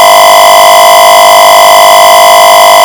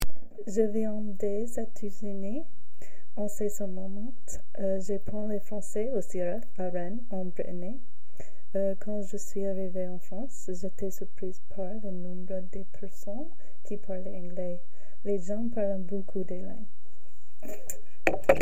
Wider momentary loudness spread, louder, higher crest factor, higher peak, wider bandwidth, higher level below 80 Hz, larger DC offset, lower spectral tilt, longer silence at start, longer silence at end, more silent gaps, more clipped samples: second, 0 LU vs 13 LU; first, 0 LUFS vs -35 LUFS; second, 0 dB vs 24 dB; first, 0 dBFS vs -4 dBFS; first, over 20 kHz vs 16 kHz; first, -40 dBFS vs -50 dBFS; second, 0.5% vs 9%; second, 0.5 dB/octave vs -6 dB/octave; about the same, 0 s vs 0 s; about the same, 0 s vs 0 s; neither; first, 40% vs under 0.1%